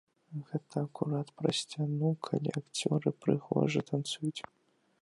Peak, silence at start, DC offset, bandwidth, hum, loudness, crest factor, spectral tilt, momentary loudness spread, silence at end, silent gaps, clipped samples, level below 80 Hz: -14 dBFS; 0.3 s; under 0.1%; 11.5 kHz; none; -34 LUFS; 20 dB; -6 dB/octave; 9 LU; 0.6 s; none; under 0.1%; -74 dBFS